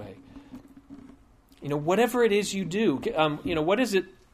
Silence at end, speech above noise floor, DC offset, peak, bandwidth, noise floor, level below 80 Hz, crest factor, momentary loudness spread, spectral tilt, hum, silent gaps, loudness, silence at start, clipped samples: 0.2 s; 31 dB; under 0.1%; -8 dBFS; 15.5 kHz; -56 dBFS; -56 dBFS; 20 dB; 18 LU; -5 dB/octave; none; none; -26 LUFS; 0 s; under 0.1%